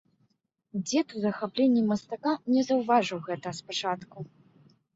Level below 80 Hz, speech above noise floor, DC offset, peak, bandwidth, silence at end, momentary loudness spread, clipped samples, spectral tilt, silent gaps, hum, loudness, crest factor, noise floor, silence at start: -72 dBFS; 46 dB; under 0.1%; -10 dBFS; 8 kHz; 0.7 s; 13 LU; under 0.1%; -5 dB/octave; none; none; -28 LUFS; 18 dB; -73 dBFS; 0.75 s